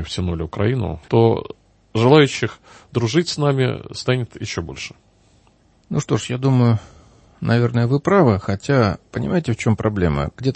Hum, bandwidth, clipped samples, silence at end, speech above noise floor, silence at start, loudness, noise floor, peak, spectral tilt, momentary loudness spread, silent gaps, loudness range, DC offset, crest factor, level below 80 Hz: none; 8.8 kHz; under 0.1%; 0 s; 37 dB; 0 s; -19 LUFS; -56 dBFS; 0 dBFS; -6.5 dB/octave; 12 LU; none; 5 LU; under 0.1%; 18 dB; -42 dBFS